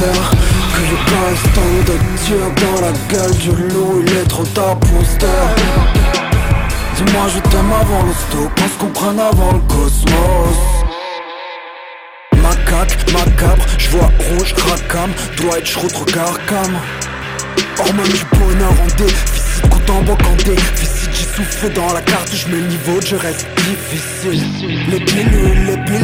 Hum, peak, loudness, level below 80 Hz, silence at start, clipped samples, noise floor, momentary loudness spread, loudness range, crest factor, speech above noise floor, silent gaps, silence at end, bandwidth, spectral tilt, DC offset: none; 0 dBFS; -14 LUFS; -16 dBFS; 0 s; under 0.1%; -33 dBFS; 6 LU; 3 LU; 12 dB; 21 dB; none; 0 s; 16.5 kHz; -4.5 dB/octave; under 0.1%